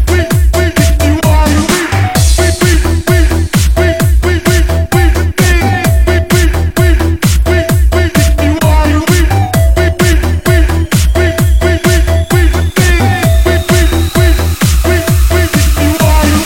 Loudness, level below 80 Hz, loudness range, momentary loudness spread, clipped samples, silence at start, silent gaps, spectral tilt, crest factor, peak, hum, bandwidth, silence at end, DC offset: -10 LUFS; -12 dBFS; 0 LU; 2 LU; 0.3%; 0 s; none; -5 dB/octave; 8 dB; 0 dBFS; none; 17 kHz; 0 s; under 0.1%